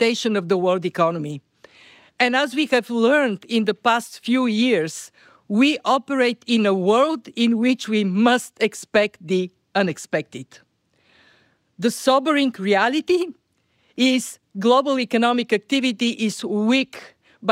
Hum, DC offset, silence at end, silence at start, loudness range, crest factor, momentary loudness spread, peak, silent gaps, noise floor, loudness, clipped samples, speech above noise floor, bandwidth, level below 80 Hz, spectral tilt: none; under 0.1%; 0 s; 0 s; 4 LU; 16 dB; 8 LU; -6 dBFS; none; -65 dBFS; -20 LUFS; under 0.1%; 45 dB; 16 kHz; -70 dBFS; -4.5 dB/octave